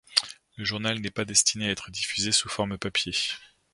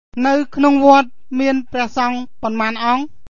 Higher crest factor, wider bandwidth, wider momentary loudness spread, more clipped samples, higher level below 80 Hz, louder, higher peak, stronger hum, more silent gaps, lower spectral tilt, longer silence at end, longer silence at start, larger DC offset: first, 28 dB vs 16 dB; first, 11.5 kHz vs 7.4 kHz; about the same, 9 LU vs 10 LU; neither; second, -56 dBFS vs -50 dBFS; second, -26 LUFS vs -16 LUFS; about the same, 0 dBFS vs 0 dBFS; neither; neither; second, -1.5 dB/octave vs -4.5 dB/octave; first, 0.3 s vs 0 s; about the same, 0.1 s vs 0.15 s; second, under 0.1% vs 3%